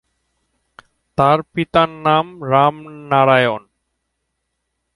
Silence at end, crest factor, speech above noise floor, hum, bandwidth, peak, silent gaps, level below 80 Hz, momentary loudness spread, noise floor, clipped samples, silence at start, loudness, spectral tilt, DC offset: 1.35 s; 18 dB; 58 dB; none; 11.5 kHz; 0 dBFS; none; -52 dBFS; 9 LU; -74 dBFS; under 0.1%; 1.2 s; -16 LUFS; -7 dB/octave; under 0.1%